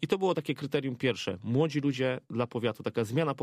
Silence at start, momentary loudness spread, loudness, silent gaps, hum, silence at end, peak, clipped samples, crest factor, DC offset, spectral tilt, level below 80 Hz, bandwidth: 0 s; 5 LU; -31 LUFS; none; none; 0 s; -14 dBFS; under 0.1%; 16 dB; under 0.1%; -6.5 dB/octave; -70 dBFS; 15 kHz